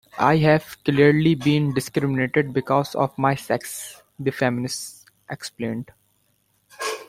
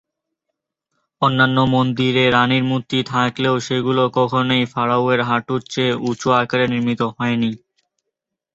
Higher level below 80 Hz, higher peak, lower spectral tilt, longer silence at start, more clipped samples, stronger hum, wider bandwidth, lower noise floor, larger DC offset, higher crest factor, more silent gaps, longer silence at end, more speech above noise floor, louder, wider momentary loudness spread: about the same, -56 dBFS vs -54 dBFS; about the same, -4 dBFS vs -2 dBFS; about the same, -6 dB/octave vs -6 dB/octave; second, 0.15 s vs 1.2 s; neither; neither; first, 16 kHz vs 7.8 kHz; second, -66 dBFS vs -80 dBFS; neither; about the same, 20 dB vs 16 dB; neither; second, 0.05 s vs 1 s; second, 45 dB vs 63 dB; second, -22 LUFS vs -18 LUFS; first, 17 LU vs 6 LU